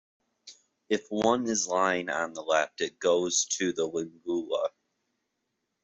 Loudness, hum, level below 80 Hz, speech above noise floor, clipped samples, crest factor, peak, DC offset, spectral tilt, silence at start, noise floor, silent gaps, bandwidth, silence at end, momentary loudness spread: -28 LUFS; none; -70 dBFS; 53 dB; under 0.1%; 20 dB; -10 dBFS; under 0.1%; -2.5 dB/octave; 0.45 s; -81 dBFS; none; 8.2 kHz; 1.15 s; 7 LU